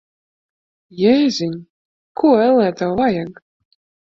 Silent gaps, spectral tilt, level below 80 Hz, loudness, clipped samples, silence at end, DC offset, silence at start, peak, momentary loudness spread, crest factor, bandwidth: 1.70-2.15 s; -6 dB/octave; -56 dBFS; -16 LUFS; under 0.1%; 0.75 s; under 0.1%; 0.95 s; -2 dBFS; 17 LU; 16 dB; 7.6 kHz